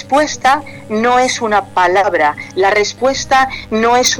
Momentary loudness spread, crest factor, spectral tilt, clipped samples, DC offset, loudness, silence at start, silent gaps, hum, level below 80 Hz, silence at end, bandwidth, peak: 5 LU; 10 dB; -2.5 dB/octave; under 0.1%; under 0.1%; -13 LUFS; 0 s; none; none; -44 dBFS; 0 s; 17.5 kHz; -4 dBFS